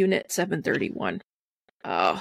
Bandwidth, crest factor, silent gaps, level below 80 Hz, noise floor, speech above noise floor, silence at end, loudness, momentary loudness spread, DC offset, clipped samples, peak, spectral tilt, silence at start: 15.5 kHz; 20 dB; 1.24-1.66 s, 1.72-1.80 s; -66 dBFS; -71 dBFS; 45 dB; 0 s; -27 LUFS; 11 LU; under 0.1%; under 0.1%; -8 dBFS; -4.5 dB/octave; 0 s